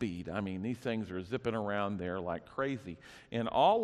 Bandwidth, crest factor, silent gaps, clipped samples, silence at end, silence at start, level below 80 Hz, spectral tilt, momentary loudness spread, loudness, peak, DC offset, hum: 12.5 kHz; 20 dB; none; under 0.1%; 0 s; 0 s; -64 dBFS; -7 dB/octave; 8 LU; -36 LUFS; -14 dBFS; under 0.1%; none